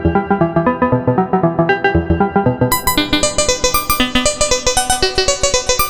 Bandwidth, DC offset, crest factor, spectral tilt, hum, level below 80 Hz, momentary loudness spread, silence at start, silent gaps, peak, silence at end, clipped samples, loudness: over 20 kHz; under 0.1%; 14 dB; -3.5 dB/octave; none; -28 dBFS; 2 LU; 0 s; none; 0 dBFS; 0 s; under 0.1%; -14 LUFS